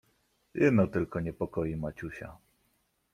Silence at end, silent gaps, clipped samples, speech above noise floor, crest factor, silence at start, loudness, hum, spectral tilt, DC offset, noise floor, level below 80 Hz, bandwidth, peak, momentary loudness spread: 0.75 s; none; under 0.1%; 44 dB; 20 dB; 0.55 s; -30 LUFS; none; -9 dB/octave; under 0.1%; -74 dBFS; -56 dBFS; 14 kHz; -12 dBFS; 18 LU